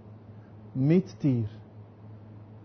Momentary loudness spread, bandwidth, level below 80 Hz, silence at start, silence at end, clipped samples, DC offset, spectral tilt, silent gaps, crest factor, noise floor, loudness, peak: 24 LU; 6.4 kHz; -60 dBFS; 0.05 s; 0.05 s; under 0.1%; under 0.1%; -9.5 dB/octave; none; 18 dB; -48 dBFS; -28 LUFS; -12 dBFS